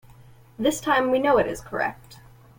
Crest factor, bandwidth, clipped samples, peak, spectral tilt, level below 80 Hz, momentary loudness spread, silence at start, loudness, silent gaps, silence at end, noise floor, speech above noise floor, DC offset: 16 dB; 17 kHz; under 0.1%; -8 dBFS; -4 dB/octave; -52 dBFS; 8 LU; 0.6 s; -23 LUFS; none; 0.4 s; -50 dBFS; 27 dB; under 0.1%